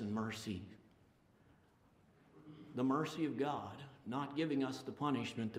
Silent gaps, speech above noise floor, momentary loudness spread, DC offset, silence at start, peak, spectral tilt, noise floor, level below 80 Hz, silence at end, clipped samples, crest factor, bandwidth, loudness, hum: none; 30 dB; 14 LU; under 0.1%; 0 s; -24 dBFS; -6 dB/octave; -70 dBFS; -78 dBFS; 0 s; under 0.1%; 18 dB; 15 kHz; -40 LUFS; none